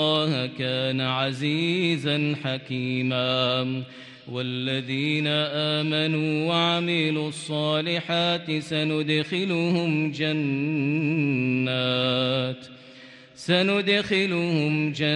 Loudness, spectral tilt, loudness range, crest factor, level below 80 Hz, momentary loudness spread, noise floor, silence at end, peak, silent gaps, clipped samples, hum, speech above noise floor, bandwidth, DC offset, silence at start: -24 LUFS; -6 dB/octave; 2 LU; 16 dB; -66 dBFS; 7 LU; -47 dBFS; 0 s; -8 dBFS; none; under 0.1%; none; 23 dB; 10.5 kHz; under 0.1%; 0 s